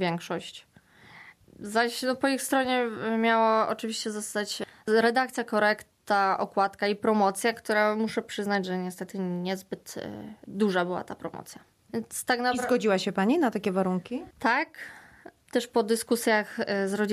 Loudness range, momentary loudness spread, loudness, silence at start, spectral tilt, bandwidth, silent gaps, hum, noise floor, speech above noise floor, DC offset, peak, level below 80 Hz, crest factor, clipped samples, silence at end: 5 LU; 14 LU; -27 LUFS; 0 s; -4.5 dB/octave; 14.5 kHz; none; none; -54 dBFS; 27 dB; under 0.1%; -10 dBFS; -70 dBFS; 16 dB; under 0.1%; 0 s